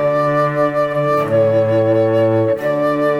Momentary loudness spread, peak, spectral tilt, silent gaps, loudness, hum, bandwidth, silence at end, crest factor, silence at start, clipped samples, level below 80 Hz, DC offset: 3 LU; -4 dBFS; -8 dB/octave; none; -15 LUFS; none; 12 kHz; 0 s; 12 dB; 0 s; under 0.1%; -54 dBFS; under 0.1%